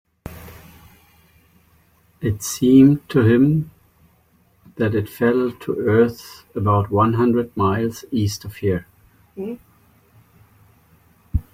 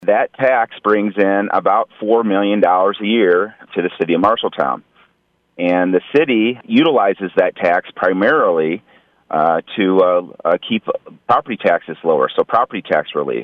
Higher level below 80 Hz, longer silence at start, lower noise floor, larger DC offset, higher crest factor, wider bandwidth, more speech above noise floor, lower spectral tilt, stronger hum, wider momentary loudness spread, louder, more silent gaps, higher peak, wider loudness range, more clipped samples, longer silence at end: first, -42 dBFS vs -62 dBFS; first, 0.25 s vs 0 s; second, -58 dBFS vs -62 dBFS; neither; about the same, 18 dB vs 14 dB; first, 16.5 kHz vs 5.6 kHz; second, 40 dB vs 47 dB; about the same, -7 dB/octave vs -8 dB/octave; neither; first, 18 LU vs 7 LU; second, -19 LUFS vs -16 LUFS; neither; about the same, -2 dBFS vs -2 dBFS; first, 8 LU vs 2 LU; neither; first, 0.15 s vs 0 s